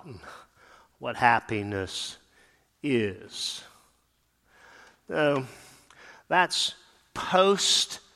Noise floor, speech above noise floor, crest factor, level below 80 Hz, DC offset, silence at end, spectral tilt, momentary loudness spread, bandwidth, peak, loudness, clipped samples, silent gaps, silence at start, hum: -70 dBFS; 43 dB; 24 dB; -64 dBFS; under 0.1%; 0.15 s; -3 dB/octave; 19 LU; 15.5 kHz; -4 dBFS; -26 LUFS; under 0.1%; none; 0.05 s; none